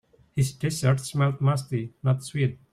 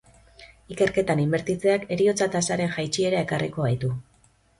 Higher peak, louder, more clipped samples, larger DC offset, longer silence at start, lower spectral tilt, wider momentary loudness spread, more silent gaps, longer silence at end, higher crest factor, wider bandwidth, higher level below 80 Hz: about the same, -10 dBFS vs -8 dBFS; about the same, -26 LUFS vs -24 LUFS; neither; neither; about the same, 0.35 s vs 0.4 s; about the same, -6 dB/octave vs -5 dB/octave; about the same, 5 LU vs 5 LU; neither; second, 0.15 s vs 0.6 s; about the same, 16 dB vs 16 dB; first, 14.5 kHz vs 11.5 kHz; about the same, -56 dBFS vs -56 dBFS